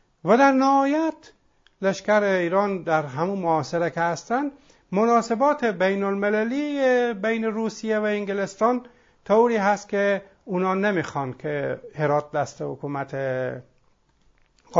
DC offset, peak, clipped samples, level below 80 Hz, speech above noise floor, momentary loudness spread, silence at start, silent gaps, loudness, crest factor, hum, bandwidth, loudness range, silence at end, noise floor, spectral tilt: under 0.1%; -4 dBFS; under 0.1%; -64 dBFS; 40 dB; 10 LU; 0.25 s; none; -23 LUFS; 20 dB; none; 7.8 kHz; 4 LU; 0 s; -62 dBFS; -6 dB/octave